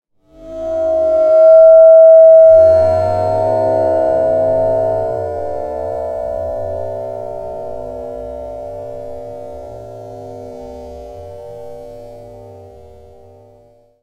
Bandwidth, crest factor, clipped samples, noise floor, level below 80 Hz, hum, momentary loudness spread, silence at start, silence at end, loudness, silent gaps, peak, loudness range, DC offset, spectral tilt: 4.6 kHz; 14 dB; under 0.1%; -48 dBFS; -42 dBFS; none; 27 LU; 0.4 s; 1.4 s; -11 LUFS; none; 0 dBFS; 24 LU; under 0.1%; -8.5 dB/octave